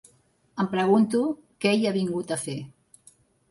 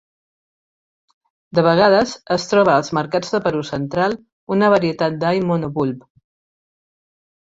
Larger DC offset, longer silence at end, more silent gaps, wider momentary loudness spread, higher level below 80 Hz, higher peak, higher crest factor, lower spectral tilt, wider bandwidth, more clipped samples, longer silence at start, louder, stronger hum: neither; second, 0.8 s vs 1.5 s; second, none vs 4.32-4.47 s; first, 15 LU vs 9 LU; second, -68 dBFS vs -56 dBFS; second, -10 dBFS vs -2 dBFS; about the same, 16 dB vs 18 dB; about the same, -5.5 dB/octave vs -6 dB/octave; first, 11.5 kHz vs 7.8 kHz; neither; second, 0.55 s vs 1.55 s; second, -25 LUFS vs -18 LUFS; neither